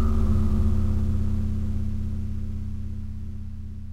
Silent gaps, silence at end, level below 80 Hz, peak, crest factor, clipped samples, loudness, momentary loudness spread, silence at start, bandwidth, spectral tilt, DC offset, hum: none; 0 s; -28 dBFS; -12 dBFS; 12 dB; under 0.1%; -28 LUFS; 13 LU; 0 s; 5.6 kHz; -9.5 dB/octave; under 0.1%; none